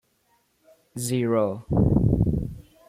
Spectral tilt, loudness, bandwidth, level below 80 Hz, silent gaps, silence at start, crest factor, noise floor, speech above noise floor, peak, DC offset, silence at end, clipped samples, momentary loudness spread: -7.5 dB/octave; -24 LUFS; 15.5 kHz; -36 dBFS; none; 0.95 s; 18 dB; -67 dBFS; 45 dB; -8 dBFS; under 0.1%; 0.3 s; under 0.1%; 13 LU